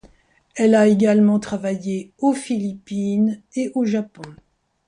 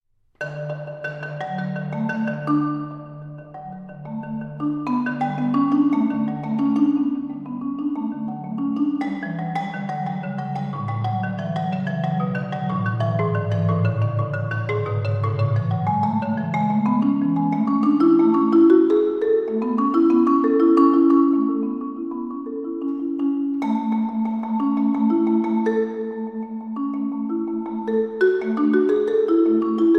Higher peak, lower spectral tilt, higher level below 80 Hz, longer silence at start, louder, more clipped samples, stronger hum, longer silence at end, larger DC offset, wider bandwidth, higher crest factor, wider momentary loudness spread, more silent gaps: about the same, -4 dBFS vs -4 dBFS; second, -7 dB/octave vs -10 dB/octave; about the same, -60 dBFS vs -62 dBFS; first, 0.55 s vs 0.4 s; about the same, -20 LUFS vs -21 LUFS; neither; neither; first, 0.55 s vs 0 s; neither; first, 11 kHz vs 6.4 kHz; about the same, 16 dB vs 16 dB; about the same, 12 LU vs 13 LU; neither